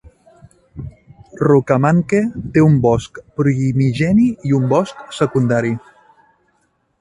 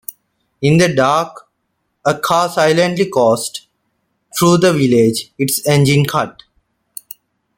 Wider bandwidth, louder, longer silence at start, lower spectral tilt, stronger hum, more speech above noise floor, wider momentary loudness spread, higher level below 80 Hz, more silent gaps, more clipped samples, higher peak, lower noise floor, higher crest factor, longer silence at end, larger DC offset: second, 11 kHz vs 17 kHz; about the same, -16 LUFS vs -14 LUFS; first, 0.75 s vs 0.6 s; first, -8 dB/octave vs -5 dB/octave; neither; second, 49 dB vs 56 dB; second, 15 LU vs 20 LU; first, -44 dBFS vs -52 dBFS; neither; neither; about the same, 0 dBFS vs -2 dBFS; second, -63 dBFS vs -69 dBFS; about the same, 16 dB vs 14 dB; about the same, 1.25 s vs 1.25 s; neither